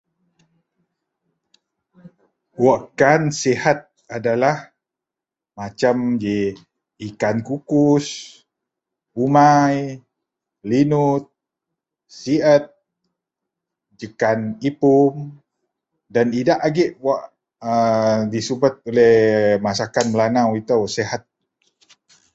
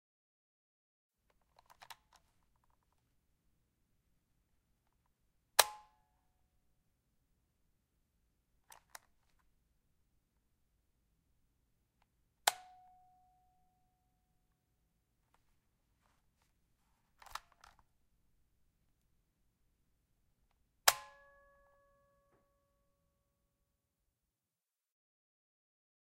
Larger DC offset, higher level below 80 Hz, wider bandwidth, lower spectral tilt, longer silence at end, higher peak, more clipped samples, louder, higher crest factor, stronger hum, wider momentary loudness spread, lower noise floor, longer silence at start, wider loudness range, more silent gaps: neither; first, -58 dBFS vs -78 dBFS; second, 8.2 kHz vs 15 kHz; first, -6 dB/octave vs 2 dB/octave; second, 1.15 s vs 5 s; first, 0 dBFS vs -6 dBFS; neither; first, -18 LUFS vs -33 LUFS; second, 20 dB vs 42 dB; neither; second, 17 LU vs 26 LU; about the same, -87 dBFS vs under -90 dBFS; second, 2.6 s vs 5.6 s; second, 5 LU vs 20 LU; neither